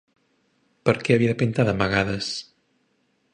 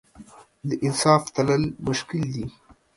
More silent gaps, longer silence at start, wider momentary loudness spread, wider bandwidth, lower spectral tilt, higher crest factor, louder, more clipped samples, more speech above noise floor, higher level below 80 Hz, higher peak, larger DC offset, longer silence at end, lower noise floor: neither; first, 0.85 s vs 0.2 s; second, 8 LU vs 14 LU; second, 10 kHz vs 11.5 kHz; about the same, -6 dB/octave vs -5 dB/octave; about the same, 22 dB vs 22 dB; about the same, -23 LUFS vs -23 LUFS; neither; first, 47 dB vs 25 dB; about the same, -50 dBFS vs -54 dBFS; about the same, -2 dBFS vs -4 dBFS; neither; first, 0.9 s vs 0.45 s; first, -68 dBFS vs -48 dBFS